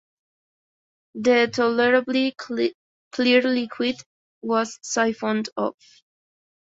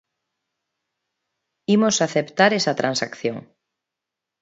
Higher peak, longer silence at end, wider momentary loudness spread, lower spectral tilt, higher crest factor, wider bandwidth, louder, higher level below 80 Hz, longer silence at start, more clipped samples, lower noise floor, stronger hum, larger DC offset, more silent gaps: second, -4 dBFS vs 0 dBFS; about the same, 0.95 s vs 1 s; about the same, 10 LU vs 11 LU; about the same, -3.5 dB/octave vs -4 dB/octave; about the same, 20 dB vs 22 dB; about the same, 8 kHz vs 8 kHz; about the same, -22 LUFS vs -20 LUFS; about the same, -70 dBFS vs -70 dBFS; second, 1.15 s vs 1.7 s; neither; first, under -90 dBFS vs -85 dBFS; neither; neither; first, 2.74-3.11 s, 4.06-4.41 s vs none